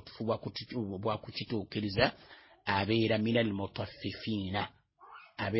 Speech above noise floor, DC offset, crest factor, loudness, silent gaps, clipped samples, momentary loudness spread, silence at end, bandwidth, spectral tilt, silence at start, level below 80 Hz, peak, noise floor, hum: 22 dB; under 0.1%; 22 dB; -34 LUFS; none; under 0.1%; 11 LU; 0 s; 5.8 kHz; -9.5 dB/octave; 0.05 s; -58 dBFS; -12 dBFS; -55 dBFS; none